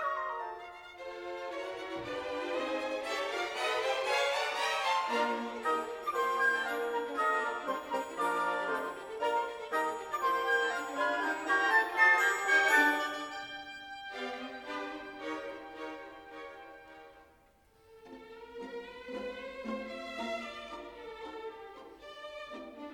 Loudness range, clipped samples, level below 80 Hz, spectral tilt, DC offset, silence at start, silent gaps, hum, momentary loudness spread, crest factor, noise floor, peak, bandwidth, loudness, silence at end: 17 LU; under 0.1%; -70 dBFS; -1.5 dB/octave; under 0.1%; 0 s; none; none; 20 LU; 22 dB; -65 dBFS; -12 dBFS; 19 kHz; -32 LUFS; 0 s